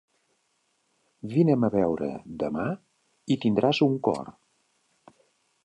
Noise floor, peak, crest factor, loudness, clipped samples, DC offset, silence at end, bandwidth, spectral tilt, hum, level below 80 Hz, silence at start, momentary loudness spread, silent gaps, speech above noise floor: -72 dBFS; -8 dBFS; 20 dB; -26 LUFS; under 0.1%; under 0.1%; 1.35 s; 9.6 kHz; -7.5 dB/octave; none; -62 dBFS; 1.25 s; 16 LU; none; 47 dB